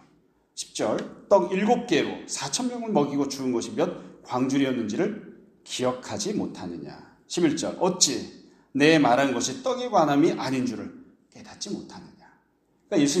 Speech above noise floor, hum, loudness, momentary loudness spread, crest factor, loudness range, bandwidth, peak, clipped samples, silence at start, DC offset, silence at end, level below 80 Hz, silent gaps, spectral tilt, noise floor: 41 dB; none; -25 LUFS; 16 LU; 22 dB; 6 LU; 14 kHz; -4 dBFS; under 0.1%; 0.55 s; under 0.1%; 0 s; -66 dBFS; none; -4 dB/octave; -66 dBFS